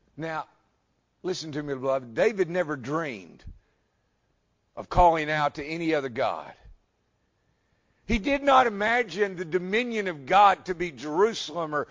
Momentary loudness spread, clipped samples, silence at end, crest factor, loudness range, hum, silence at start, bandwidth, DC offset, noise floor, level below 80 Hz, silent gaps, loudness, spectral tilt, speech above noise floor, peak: 13 LU; under 0.1%; 0.05 s; 20 dB; 7 LU; none; 0.15 s; 7.6 kHz; under 0.1%; -72 dBFS; -46 dBFS; none; -26 LUFS; -5 dB/octave; 46 dB; -6 dBFS